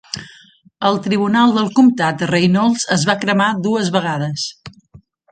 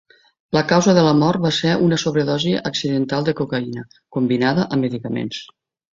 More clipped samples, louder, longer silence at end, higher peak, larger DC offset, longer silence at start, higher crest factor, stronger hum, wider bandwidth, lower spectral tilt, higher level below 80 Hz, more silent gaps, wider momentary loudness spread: neither; first, -16 LUFS vs -19 LUFS; first, 0.65 s vs 0.5 s; about the same, 0 dBFS vs -2 dBFS; neither; second, 0.15 s vs 0.5 s; about the same, 16 dB vs 18 dB; neither; first, 9.2 kHz vs 7.8 kHz; about the same, -5 dB/octave vs -5.5 dB/octave; about the same, -56 dBFS vs -54 dBFS; neither; about the same, 9 LU vs 11 LU